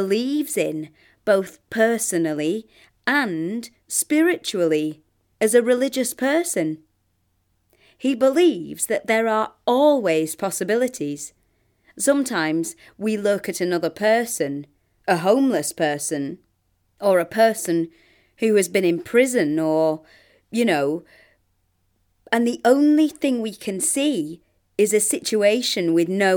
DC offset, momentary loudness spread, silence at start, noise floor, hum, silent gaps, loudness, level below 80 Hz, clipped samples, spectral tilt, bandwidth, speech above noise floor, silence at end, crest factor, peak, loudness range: under 0.1%; 11 LU; 0 s; -68 dBFS; none; none; -21 LUFS; -68 dBFS; under 0.1%; -4 dB/octave; 19.5 kHz; 47 dB; 0 s; 18 dB; -4 dBFS; 3 LU